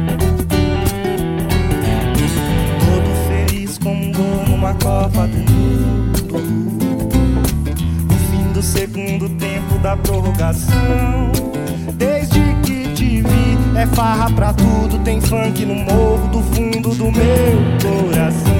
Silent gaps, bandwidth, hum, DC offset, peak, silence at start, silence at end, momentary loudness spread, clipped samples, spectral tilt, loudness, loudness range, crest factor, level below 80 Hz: none; 17 kHz; none; under 0.1%; -2 dBFS; 0 s; 0 s; 5 LU; under 0.1%; -6.5 dB/octave; -16 LUFS; 2 LU; 12 dB; -22 dBFS